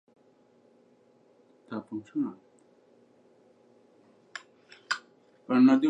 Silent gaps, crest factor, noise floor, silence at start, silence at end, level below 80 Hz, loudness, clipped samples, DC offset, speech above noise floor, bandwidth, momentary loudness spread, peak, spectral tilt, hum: none; 22 dB; -63 dBFS; 1.7 s; 0 s; -86 dBFS; -30 LUFS; under 0.1%; under 0.1%; 38 dB; 8.2 kHz; 29 LU; -10 dBFS; -5.5 dB/octave; none